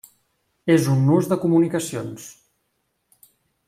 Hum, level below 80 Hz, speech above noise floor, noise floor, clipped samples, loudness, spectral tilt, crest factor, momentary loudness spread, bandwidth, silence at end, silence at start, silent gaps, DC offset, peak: none; -64 dBFS; 53 dB; -72 dBFS; under 0.1%; -20 LUFS; -7 dB/octave; 18 dB; 17 LU; 15.5 kHz; 1.35 s; 0.65 s; none; under 0.1%; -6 dBFS